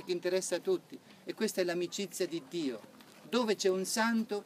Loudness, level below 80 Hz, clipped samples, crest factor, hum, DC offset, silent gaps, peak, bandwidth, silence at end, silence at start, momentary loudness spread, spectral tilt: -34 LUFS; -90 dBFS; under 0.1%; 18 dB; none; under 0.1%; none; -18 dBFS; 15.5 kHz; 0 s; 0 s; 10 LU; -3.5 dB/octave